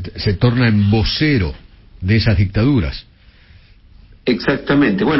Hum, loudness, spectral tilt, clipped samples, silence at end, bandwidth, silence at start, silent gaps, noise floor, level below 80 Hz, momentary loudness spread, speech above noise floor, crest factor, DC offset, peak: none; -16 LUFS; -9.5 dB/octave; under 0.1%; 0 s; 5.8 kHz; 0 s; none; -45 dBFS; -30 dBFS; 11 LU; 30 dB; 14 dB; under 0.1%; -2 dBFS